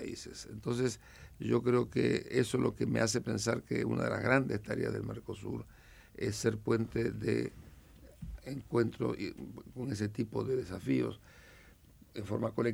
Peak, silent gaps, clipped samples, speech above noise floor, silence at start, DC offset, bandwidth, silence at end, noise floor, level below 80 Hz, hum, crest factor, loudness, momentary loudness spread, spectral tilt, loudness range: -14 dBFS; none; under 0.1%; 26 dB; 0 s; under 0.1%; 16.5 kHz; 0 s; -60 dBFS; -58 dBFS; none; 20 dB; -34 LUFS; 15 LU; -6 dB/octave; 5 LU